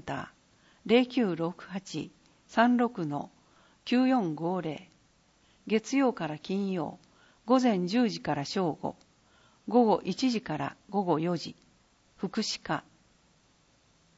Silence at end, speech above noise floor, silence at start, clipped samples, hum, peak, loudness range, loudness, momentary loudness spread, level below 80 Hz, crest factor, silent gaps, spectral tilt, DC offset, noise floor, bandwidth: 1.35 s; 37 dB; 0.05 s; under 0.1%; none; -10 dBFS; 4 LU; -30 LUFS; 15 LU; -70 dBFS; 20 dB; none; -5.5 dB/octave; under 0.1%; -66 dBFS; 8 kHz